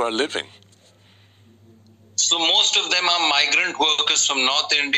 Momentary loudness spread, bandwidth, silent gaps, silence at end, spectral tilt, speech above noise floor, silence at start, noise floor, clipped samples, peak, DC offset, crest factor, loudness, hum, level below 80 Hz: 10 LU; 14.5 kHz; none; 0 s; 1 dB/octave; 34 dB; 0 s; -53 dBFS; under 0.1%; -6 dBFS; under 0.1%; 16 dB; -17 LUFS; none; -70 dBFS